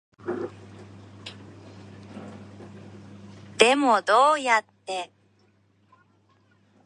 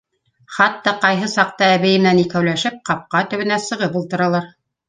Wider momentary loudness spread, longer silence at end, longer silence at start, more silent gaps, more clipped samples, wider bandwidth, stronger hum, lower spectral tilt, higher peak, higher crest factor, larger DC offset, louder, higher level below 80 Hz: first, 27 LU vs 7 LU; first, 1.8 s vs 0.4 s; second, 0.25 s vs 0.5 s; neither; neither; first, 11 kHz vs 9.6 kHz; neither; second, -3 dB/octave vs -5 dB/octave; about the same, 0 dBFS vs -2 dBFS; first, 26 dB vs 16 dB; neither; second, -22 LUFS vs -17 LUFS; second, -66 dBFS vs -60 dBFS